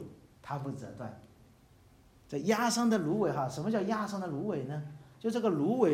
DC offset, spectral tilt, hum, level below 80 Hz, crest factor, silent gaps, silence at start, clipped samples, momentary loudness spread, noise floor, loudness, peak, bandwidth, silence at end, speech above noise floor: under 0.1%; -5.5 dB/octave; none; -68 dBFS; 20 dB; none; 0 s; under 0.1%; 16 LU; -61 dBFS; -33 LUFS; -14 dBFS; 16 kHz; 0 s; 29 dB